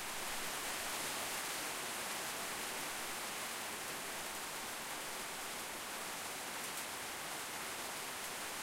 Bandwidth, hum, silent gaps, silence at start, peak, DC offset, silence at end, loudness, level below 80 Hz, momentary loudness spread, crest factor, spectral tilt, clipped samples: 16 kHz; none; none; 0 s; -28 dBFS; under 0.1%; 0 s; -41 LUFS; -70 dBFS; 3 LU; 14 dB; -0.5 dB/octave; under 0.1%